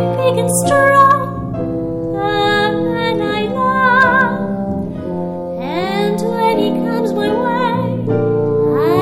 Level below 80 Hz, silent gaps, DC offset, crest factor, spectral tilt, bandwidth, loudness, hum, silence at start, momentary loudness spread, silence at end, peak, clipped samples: -42 dBFS; none; under 0.1%; 14 dB; -5 dB/octave; 16 kHz; -15 LUFS; none; 0 s; 11 LU; 0 s; 0 dBFS; under 0.1%